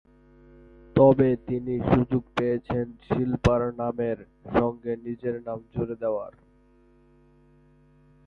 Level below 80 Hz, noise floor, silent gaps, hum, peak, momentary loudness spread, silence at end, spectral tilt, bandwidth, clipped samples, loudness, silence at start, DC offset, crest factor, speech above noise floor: -46 dBFS; -59 dBFS; none; none; -6 dBFS; 13 LU; 1.95 s; -8.5 dB/octave; 7.8 kHz; under 0.1%; -26 LUFS; 0.95 s; under 0.1%; 20 dB; 34 dB